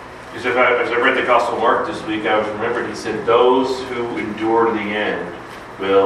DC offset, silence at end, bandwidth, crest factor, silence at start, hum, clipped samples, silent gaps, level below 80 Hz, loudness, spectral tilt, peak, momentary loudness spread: under 0.1%; 0 s; 11.5 kHz; 16 dB; 0 s; none; under 0.1%; none; -52 dBFS; -18 LUFS; -5 dB/octave; 0 dBFS; 11 LU